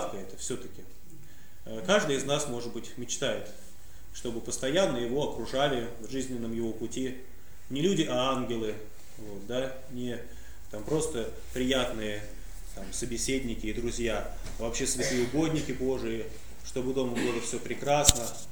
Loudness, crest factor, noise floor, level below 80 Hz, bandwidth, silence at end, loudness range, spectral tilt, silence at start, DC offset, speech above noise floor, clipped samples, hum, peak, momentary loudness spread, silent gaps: -31 LUFS; 32 dB; -53 dBFS; -46 dBFS; over 20 kHz; 0 s; 3 LU; -3.5 dB/octave; 0 s; 1%; 22 dB; under 0.1%; none; 0 dBFS; 17 LU; none